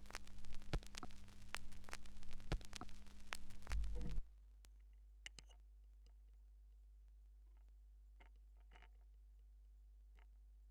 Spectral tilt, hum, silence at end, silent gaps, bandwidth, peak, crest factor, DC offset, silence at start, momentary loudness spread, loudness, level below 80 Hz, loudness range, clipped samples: -4 dB/octave; none; 0 s; none; 13.5 kHz; -22 dBFS; 26 dB; under 0.1%; 0 s; 18 LU; -54 LUFS; -54 dBFS; 14 LU; under 0.1%